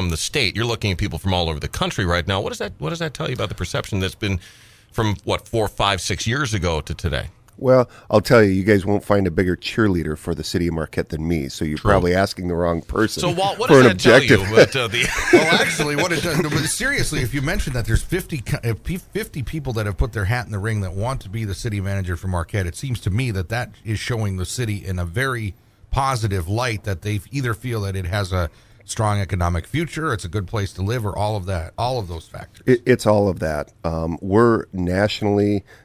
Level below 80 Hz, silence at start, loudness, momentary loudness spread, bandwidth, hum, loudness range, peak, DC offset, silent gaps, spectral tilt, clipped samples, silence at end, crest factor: -34 dBFS; 0 s; -20 LUFS; 11 LU; 16 kHz; none; 9 LU; 0 dBFS; under 0.1%; none; -5 dB/octave; under 0.1%; 0.1 s; 20 dB